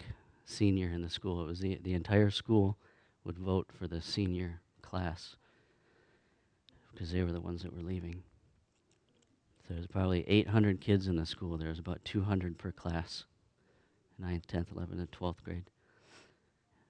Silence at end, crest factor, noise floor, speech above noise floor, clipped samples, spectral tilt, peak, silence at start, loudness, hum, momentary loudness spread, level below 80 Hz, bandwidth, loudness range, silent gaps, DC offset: 0.7 s; 24 dB; -73 dBFS; 39 dB; under 0.1%; -7 dB/octave; -12 dBFS; 0 s; -35 LUFS; none; 16 LU; -54 dBFS; 9.8 kHz; 9 LU; none; under 0.1%